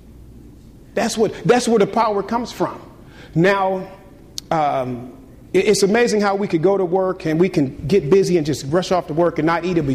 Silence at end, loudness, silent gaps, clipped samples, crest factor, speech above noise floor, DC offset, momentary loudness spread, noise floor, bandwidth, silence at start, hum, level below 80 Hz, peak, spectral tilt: 0 s; -18 LUFS; none; under 0.1%; 14 dB; 25 dB; under 0.1%; 11 LU; -42 dBFS; 15 kHz; 0.05 s; none; -46 dBFS; -4 dBFS; -5.5 dB/octave